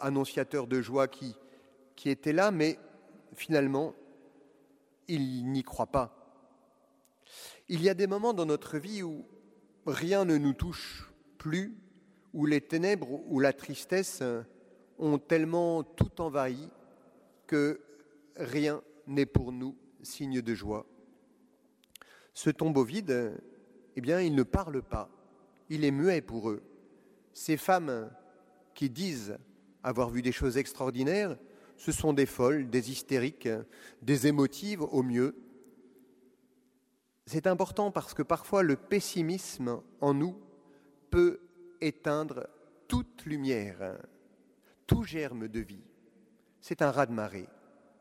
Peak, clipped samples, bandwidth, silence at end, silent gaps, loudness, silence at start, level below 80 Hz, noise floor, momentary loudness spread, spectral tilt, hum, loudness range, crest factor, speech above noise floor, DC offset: -10 dBFS; under 0.1%; 16 kHz; 0.55 s; none; -32 LUFS; 0 s; -52 dBFS; -74 dBFS; 15 LU; -6 dB/octave; none; 5 LU; 22 dB; 43 dB; under 0.1%